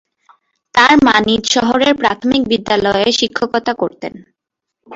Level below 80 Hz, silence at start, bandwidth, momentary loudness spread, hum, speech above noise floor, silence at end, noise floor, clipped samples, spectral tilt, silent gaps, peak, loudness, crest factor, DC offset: -46 dBFS; 0.75 s; 8 kHz; 10 LU; none; 66 dB; 0 s; -79 dBFS; under 0.1%; -3 dB/octave; none; 0 dBFS; -13 LUFS; 14 dB; under 0.1%